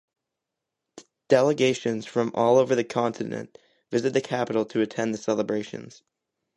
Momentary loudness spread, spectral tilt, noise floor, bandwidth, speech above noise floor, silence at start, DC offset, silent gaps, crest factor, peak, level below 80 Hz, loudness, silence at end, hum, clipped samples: 12 LU; -5.5 dB/octave; -85 dBFS; 11.5 kHz; 61 dB; 0.95 s; under 0.1%; none; 20 dB; -6 dBFS; -72 dBFS; -25 LUFS; 0.7 s; none; under 0.1%